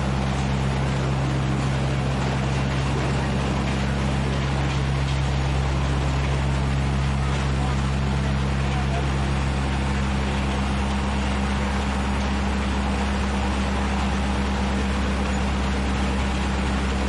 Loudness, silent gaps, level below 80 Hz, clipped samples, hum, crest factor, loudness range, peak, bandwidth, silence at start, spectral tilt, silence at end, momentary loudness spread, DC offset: -24 LUFS; none; -28 dBFS; under 0.1%; none; 10 dB; 1 LU; -12 dBFS; 11 kHz; 0 s; -6 dB/octave; 0 s; 1 LU; 0.2%